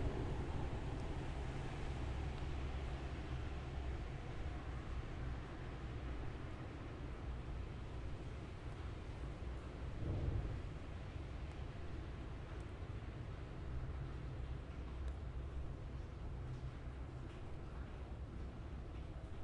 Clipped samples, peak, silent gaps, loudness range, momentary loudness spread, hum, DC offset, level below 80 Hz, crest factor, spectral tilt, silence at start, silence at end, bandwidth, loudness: under 0.1%; -28 dBFS; none; 3 LU; 6 LU; none; under 0.1%; -48 dBFS; 16 dB; -7 dB/octave; 0 s; 0 s; 10.5 kHz; -48 LUFS